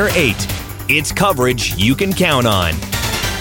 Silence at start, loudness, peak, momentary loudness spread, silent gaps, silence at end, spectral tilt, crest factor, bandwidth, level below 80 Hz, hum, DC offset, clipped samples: 0 s; -15 LUFS; 0 dBFS; 6 LU; none; 0 s; -4 dB/octave; 14 dB; 17.5 kHz; -30 dBFS; none; under 0.1%; under 0.1%